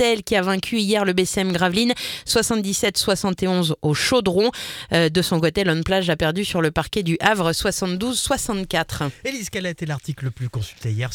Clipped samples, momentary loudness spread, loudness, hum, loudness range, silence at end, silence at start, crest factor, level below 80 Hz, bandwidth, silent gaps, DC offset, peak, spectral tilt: under 0.1%; 9 LU; -21 LUFS; none; 3 LU; 0 s; 0 s; 20 dB; -44 dBFS; 18 kHz; none; under 0.1%; -2 dBFS; -4 dB/octave